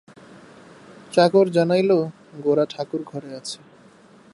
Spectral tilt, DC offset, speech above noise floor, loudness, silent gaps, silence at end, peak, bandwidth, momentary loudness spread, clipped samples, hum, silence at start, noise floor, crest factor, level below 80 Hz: -6 dB/octave; under 0.1%; 30 dB; -21 LUFS; none; 0.8 s; -2 dBFS; 11.5 kHz; 17 LU; under 0.1%; none; 1.1 s; -50 dBFS; 20 dB; -72 dBFS